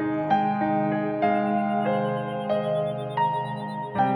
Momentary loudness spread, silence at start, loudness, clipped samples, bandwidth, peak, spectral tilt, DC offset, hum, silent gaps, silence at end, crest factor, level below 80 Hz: 6 LU; 0 s; -25 LUFS; under 0.1%; 10.5 kHz; -10 dBFS; -8.5 dB/octave; under 0.1%; none; none; 0 s; 14 dB; -64 dBFS